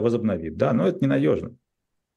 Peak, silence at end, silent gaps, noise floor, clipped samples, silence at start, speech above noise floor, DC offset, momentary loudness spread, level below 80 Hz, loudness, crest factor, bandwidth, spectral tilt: -8 dBFS; 0.65 s; none; -79 dBFS; under 0.1%; 0 s; 56 dB; under 0.1%; 6 LU; -54 dBFS; -23 LUFS; 16 dB; 8.8 kHz; -9 dB/octave